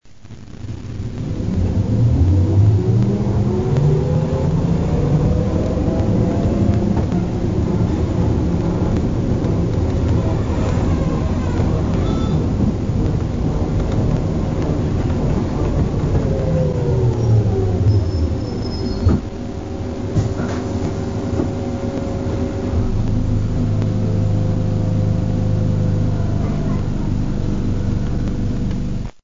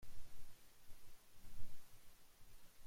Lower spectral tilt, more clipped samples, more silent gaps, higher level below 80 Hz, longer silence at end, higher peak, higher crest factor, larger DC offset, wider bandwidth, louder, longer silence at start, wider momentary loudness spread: first, -8.5 dB/octave vs -3.5 dB/octave; neither; neither; first, -26 dBFS vs -60 dBFS; about the same, 0 s vs 0 s; first, -4 dBFS vs -30 dBFS; about the same, 14 dB vs 14 dB; first, 1% vs under 0.1%; second, 7.6 kHz vs 16.5 kHz; first, -19 LUFS vs -66 LUFS; about the same, 0 s vs 0 s; about the same, 6 LU vs 4 LU